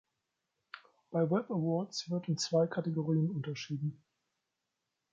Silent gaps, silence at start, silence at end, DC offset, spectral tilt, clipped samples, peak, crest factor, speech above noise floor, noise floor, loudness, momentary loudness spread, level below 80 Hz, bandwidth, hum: none; 0.75 s; 1.2 s; under 0.1%; -6 dB/octave; under 0.1%; -18 dBFS; 18 dB; 53 dB; -86 dBFS; -34 LUFS; 17 LU; -80 dBFS; 7.8 kHz; none